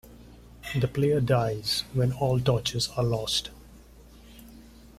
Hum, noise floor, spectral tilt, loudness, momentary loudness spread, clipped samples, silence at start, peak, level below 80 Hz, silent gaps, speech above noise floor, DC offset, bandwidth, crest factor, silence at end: none; -51 dBFS; -5 dB/octave; -26 LUFS; 5 LU; under 0.1%; 0.05 s; -12 dBFS; -50 dBFS; none; 25 dB; under 0.1%; 15.5 kHz; 18 dB; 0.1 s